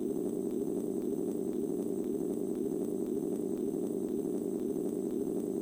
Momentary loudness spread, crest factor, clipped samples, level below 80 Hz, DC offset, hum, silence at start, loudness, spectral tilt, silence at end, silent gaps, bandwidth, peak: 0 LU; 12 dB; under 0.1%; -66 dBFS; under 0.1%; none; 0 s; -35 LUFS; -8 dB/octave; 0 s; none; 16.5 kHz; -22 dBFS